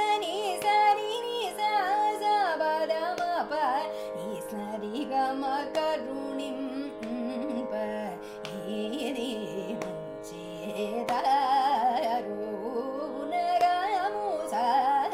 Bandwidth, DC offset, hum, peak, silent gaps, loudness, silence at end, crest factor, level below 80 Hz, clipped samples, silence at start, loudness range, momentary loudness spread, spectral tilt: 16 kHz; under 0.1%; none; -12 dBFS; none; -29 LUFS; 0 s; 16 dB; -66 dBFS; under 0.1%; 0 s; 7 LU; 11 LU; -4 dB/octave